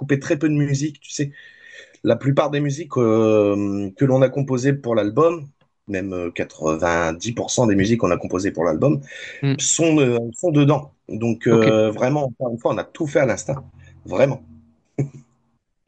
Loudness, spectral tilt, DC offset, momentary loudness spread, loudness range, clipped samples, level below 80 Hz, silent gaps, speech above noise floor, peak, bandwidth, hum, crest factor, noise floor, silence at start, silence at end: -20 LUFS; -5.5 dB/octave; under 0.1%; 11 LU; 3 LU; under 0.1%; -56 dBFS; none; 48 dB; -2 dBFS; 9.2 kHz; none; 18 dB; -67 dBFS; 0 s; 0.7 s